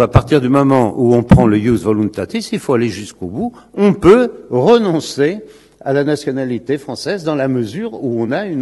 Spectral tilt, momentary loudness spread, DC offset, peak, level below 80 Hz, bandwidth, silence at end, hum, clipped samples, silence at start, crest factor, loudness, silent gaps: -7 dB/octave; 13 LU; under 0.1%; 0 dBFS; -34 dBFS; 12.5 kHz; 0 s; none; 0.4%; 0 s; 14 dB; -14 LUFS; none